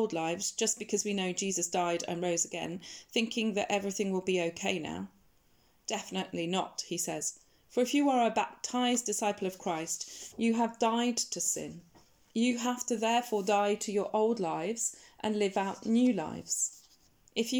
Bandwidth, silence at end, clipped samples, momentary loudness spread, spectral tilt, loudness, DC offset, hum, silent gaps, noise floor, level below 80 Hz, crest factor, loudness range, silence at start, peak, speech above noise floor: 19 kHz; 0 s; under 0.1%; 8 LU; -3 dB/octave; -32 LUFS; under 0.1%; none; none; -68 dBFS; -74 dBFS; 18 dB; 3 LU; 0 s; -14 dBFS; 37 dB